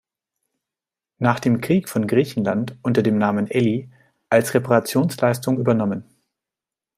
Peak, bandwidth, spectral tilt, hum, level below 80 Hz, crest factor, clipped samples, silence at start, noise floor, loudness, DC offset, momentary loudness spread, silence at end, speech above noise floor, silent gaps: -2 dBFS; 16 kHz; -6.5 dB/octave; none; -62 dBFS; 18 dB; under 0.1%; 1.2 s; -89 dBFS; -20 LUFS; under 0.1%; 5 LU; 0.95 s; 69 dB; none